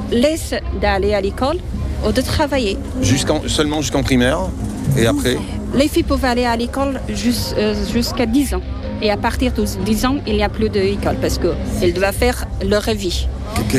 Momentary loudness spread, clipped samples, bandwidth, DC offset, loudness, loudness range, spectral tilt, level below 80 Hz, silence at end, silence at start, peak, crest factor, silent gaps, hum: 5 LU; under 0.1%; 15.5 kHz; under 0.1%; -18 LUFS; 1 LU; -5 dB/octave; -26 dBFS; 0 s; 0 s; -2 dBFS; 14 dB; none; none